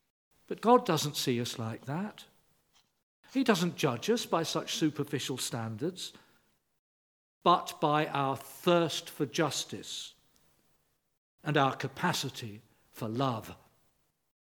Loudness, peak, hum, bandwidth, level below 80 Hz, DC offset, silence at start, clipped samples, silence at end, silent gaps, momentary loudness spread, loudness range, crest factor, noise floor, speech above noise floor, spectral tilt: -31 LUFS; -10 dBFS; none; 19 kHz; -76 dBFS; under 0.1%; 0.5 s; under 0.1%; 1 s; 3.03-3.23 s, 6.79-7.41 s, 11.17-11.38 s; 13 LU; 4 LU; 24 dB; -74 dBFS; 43 dB; -4.5 dB/octave